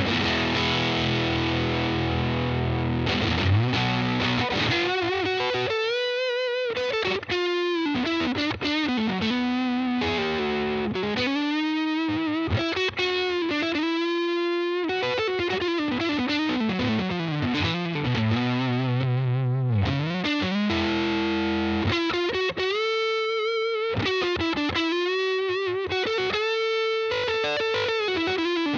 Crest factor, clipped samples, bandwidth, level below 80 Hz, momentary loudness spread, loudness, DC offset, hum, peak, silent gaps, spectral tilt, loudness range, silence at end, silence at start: 14 dB; under 0.1%; 7.6 kHz; -50 dBFS; 3 LU; -25 LUFS; under 0.1%; none; -10 dBFS; none; -6 dB/octave; 1 LU; 0 s; 0 s